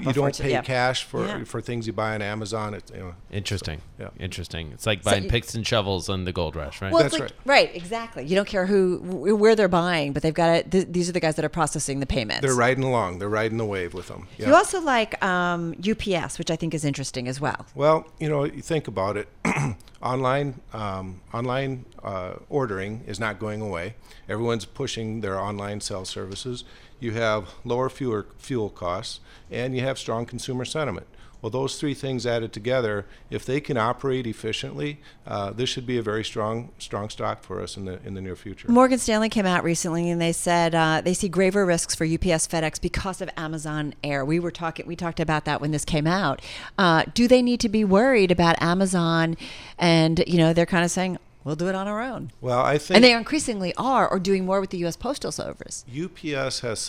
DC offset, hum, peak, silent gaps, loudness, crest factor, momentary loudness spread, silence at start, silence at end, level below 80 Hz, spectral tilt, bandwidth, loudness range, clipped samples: 0.2%; none; 0 dBFS; none; -24 LUFS; 24 dB; 14 LU; 0 s; 0 s; -46 dBFS; -5 dB/octave; 15.5 kHz; 9 LU; under 0.1%